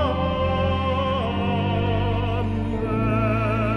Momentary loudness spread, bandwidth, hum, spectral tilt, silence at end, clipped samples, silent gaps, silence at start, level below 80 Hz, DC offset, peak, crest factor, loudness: 3 LU; 6.2 kHz; none; -8.5 dB/octave; 0 s; under 0.1%; none; 0 s; -34 dBFS; under 0.1%; -10 dBFS; 12 dB; -23 LUFS